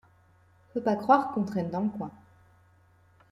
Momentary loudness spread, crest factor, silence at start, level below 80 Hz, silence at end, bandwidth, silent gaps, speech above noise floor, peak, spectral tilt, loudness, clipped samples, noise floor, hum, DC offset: 15 LU; 22 dB; 0.75 s; -70 dBFS; 1.15 s; 12 kHz; none; 34 dB; -8 dBFS; -8 dB/octave; -28 LUFS; under 0.1%; -61 dBFS; none; under 0.1%